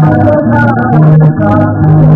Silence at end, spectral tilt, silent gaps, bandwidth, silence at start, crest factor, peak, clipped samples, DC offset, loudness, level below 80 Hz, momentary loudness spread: 0 s; -11.5 dB/octave; none; 3.4 kHz; 0 s; 6 dB; 0 dBFS; 5%; under 0.1%; -7 LUFS; -28 dBFS; 3 LU